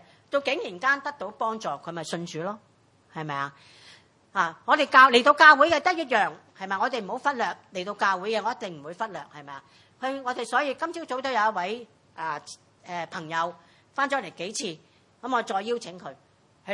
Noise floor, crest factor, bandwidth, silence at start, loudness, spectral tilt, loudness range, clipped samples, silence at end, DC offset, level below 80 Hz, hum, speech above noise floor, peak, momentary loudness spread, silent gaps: -55 dBFS; 24 dB; 11.5 kHz; 0.3 s; -25 LUFS; -3 dB/octave; 12 LU; under 0.1%; 0 s; under 0.1%; -76 dBFS; none; 29 dB; -2 dBFS; 20 LU; none